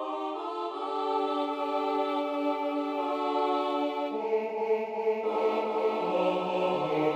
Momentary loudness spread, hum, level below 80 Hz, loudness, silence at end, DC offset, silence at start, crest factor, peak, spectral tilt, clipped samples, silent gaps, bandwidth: 4 LU; none; -80 dBFS; -30 LUFS; 0 s; under 0.1%; 0 s; 14 dB; -16 dBFS; -6.5 dB/octave; under 0.1%; none; 9.2 kHz